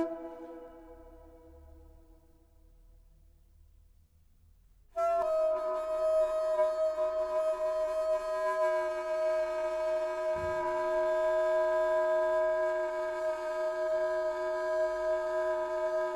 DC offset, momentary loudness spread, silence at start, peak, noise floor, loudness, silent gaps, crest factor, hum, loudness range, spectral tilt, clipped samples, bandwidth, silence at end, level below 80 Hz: under 0.1%; 5 LU; 0 s; -18 dBFS; -63 dBFS; -31 LUFS; none; 14 dB; none; 6 LU; -4.5 dB/octave; under 0.1%; 12 kHz; 0 s; -60 dBFS